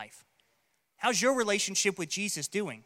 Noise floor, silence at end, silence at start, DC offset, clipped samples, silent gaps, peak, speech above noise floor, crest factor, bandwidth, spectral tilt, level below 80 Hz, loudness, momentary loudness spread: -75 dBFS; 0.05 s; 0 s; under 0.1%; under 0.1%; none; -12 dBFS; 44 dB; 20 dB; 16.5 kHz; -2 dB/octave; -80 dBFS; -29 LUFS; 6 LU